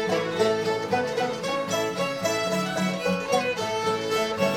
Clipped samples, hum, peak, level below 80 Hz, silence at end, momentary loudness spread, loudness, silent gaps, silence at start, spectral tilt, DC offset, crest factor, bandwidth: under 0.1%; none; -8 dBFS; -60 dBFS; 0 s; 3 LU; -26 LUFS; none; 0 s; -4 dB/octave; under 0.1%; 16 dB; 17 kHz